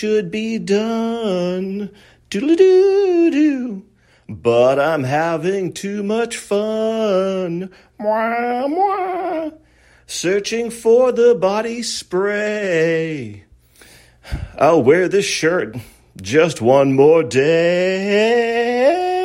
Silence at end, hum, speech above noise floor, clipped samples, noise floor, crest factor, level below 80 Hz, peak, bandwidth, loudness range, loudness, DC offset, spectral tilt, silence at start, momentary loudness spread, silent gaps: 0 s; none; 31 dB; under 0.1%; -47 dBFS; 16 dB; -46 dBFS; -2 dBFS; 13.5 kHz; 5 LU; -17 LUFS; under 0.1%; -5 dB/octave; 0 s; 14 LU; none